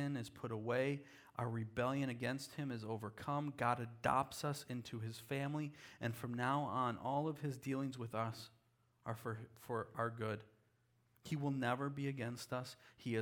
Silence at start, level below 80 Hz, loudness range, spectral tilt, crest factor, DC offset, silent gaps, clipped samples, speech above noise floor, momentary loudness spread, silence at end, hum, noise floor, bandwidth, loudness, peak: 0 s; -76 dBFS; 4 LU; -6 dB/octave; 22 dB; under 0.1%; none; under 0.1%; 35 dB; 9 LU; 0 s; none; -77 dBFS; 19.5 kHz; -42 LUFS; -20 dBFS